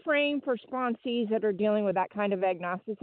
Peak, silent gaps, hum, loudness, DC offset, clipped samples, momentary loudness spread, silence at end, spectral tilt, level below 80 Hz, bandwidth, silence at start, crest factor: -14 dBFS; none; none; -29 LUFS; under 0.1%; under 0.1%; 6 LU; 0.05 s; -9.5 dB/octave; -78 dBFS; 4.5 kHz; 0.05 s; 14 dB